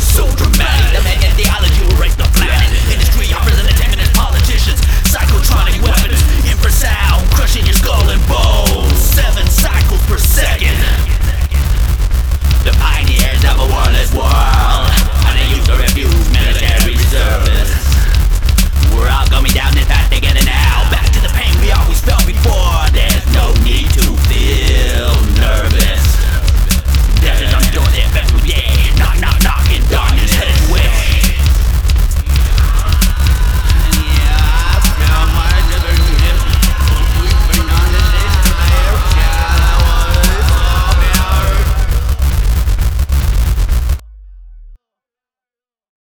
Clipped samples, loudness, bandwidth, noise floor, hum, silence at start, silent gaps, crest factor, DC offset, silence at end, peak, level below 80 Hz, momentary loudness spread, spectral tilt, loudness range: under 0.1%; -12 LUFS; over 20 kHz; under -90 dBFS; none; 0 s; none; 10 dB; under 0.1%; 1.4 s; 0 dBFS; -10 dBFS; 2 LU; -4 dB/octave; 1 LU